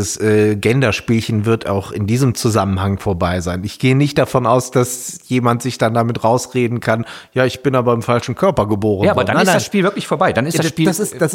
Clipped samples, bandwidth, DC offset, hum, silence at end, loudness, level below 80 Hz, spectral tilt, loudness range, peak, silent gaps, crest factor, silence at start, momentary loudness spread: under 0.1%; 17 kHz; under 0.1%; none; 0 s; -16 LUFS; -48 dBFS; -5.5 dB/octave; 2 LU; -2 dBFS; none; 14 dB; 0 s; 5 LU